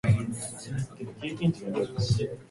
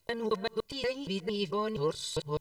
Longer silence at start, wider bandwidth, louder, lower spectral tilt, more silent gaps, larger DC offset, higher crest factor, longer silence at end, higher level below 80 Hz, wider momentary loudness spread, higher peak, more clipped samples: about the same, 0.05 s vs 0.1 s; second, 11.5 kHz vs 15.5 kHz; about the same, -31 LUFS vs -33 LUFS; first, -6 dB/octave vs -4.5 dB/octave; neither; neither; about the same, 18 dB vs 16 dB; about the same, 0.05 s vs 0 s; first, -48 dBFS vs -60 dBFS; first, 9 LU vs 3 LU; first, -12 dBFS vs -18 dBFS; neither